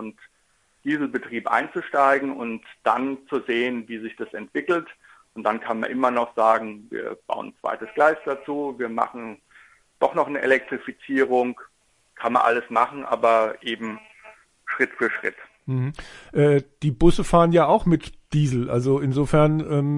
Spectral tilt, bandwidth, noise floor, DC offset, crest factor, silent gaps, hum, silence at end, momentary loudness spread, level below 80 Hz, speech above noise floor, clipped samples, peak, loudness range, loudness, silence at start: -7 dB/octave; 11.5 kHz; -56 dBFS; under 0.1%; 20 dB; none; none; 0 s; 13 LU; -42 dBFS; 34 dB; under 0.1%; -2 dBFS; 6 LU; -23 LUFS; 0 s